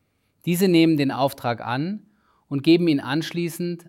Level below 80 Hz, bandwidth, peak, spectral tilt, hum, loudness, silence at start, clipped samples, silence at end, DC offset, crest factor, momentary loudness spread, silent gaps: -68 dBFS; 16 kHz; -6 dBFS; -6 dB/octave; none; -22 LUFS; 0.45 s; under 0.1%; 0.1 s; under 0.1%; 16 dB; 13 LU; none